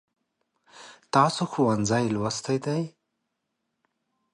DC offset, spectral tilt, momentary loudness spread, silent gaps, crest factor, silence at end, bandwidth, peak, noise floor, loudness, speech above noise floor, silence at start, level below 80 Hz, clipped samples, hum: under 0.1%; -5.5 dB/octave; 8 LU; none; 22 dB; 1.45 s; 11.5 kHz; -6 dBFS; -80 dBFS; -25 LUFS; 56 dB; 0.75 s; -62 dBFS; under 0.1%; none